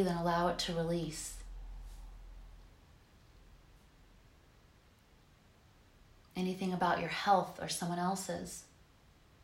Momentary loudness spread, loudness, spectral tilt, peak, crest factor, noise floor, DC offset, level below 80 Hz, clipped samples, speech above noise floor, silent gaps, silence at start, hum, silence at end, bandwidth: 23 LU; -35 LUFS; -4.5 dB/octave; -16 dBFS; 22 dB; -64 dBFS; under 0.1%; -56 dBFS; under 0.1%; 29 dB; none; 0 s; none; 0.8 s; 16 kHz